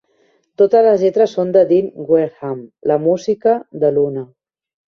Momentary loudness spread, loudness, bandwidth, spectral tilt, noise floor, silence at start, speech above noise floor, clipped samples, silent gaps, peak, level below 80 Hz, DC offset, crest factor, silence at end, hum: 11 LU; -15 LUFS; 6.8 kHz; -7.5 dB/octave; -59 dBFS; 0.6 s; 44 dB; under 0.1%; none; -2 dBFS; -62 dBFS; under 0.1%; 14 dB; 0.65 s; none